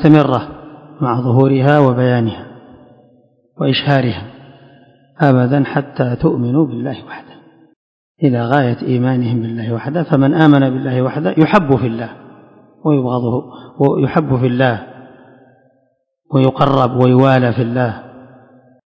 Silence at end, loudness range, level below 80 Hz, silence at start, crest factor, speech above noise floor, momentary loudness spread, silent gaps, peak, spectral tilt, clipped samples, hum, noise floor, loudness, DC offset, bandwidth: 0.75 s; 4 LU; -48 dBFS; 0 s; 14 dB; 49 dB; 14 LU; 7.76-8.15 s; 0 dBFS; -9.5 dB/octave; 0.3%; none; -62 dBFS; -14 LUFS; under 0.1%; 5.6 kHz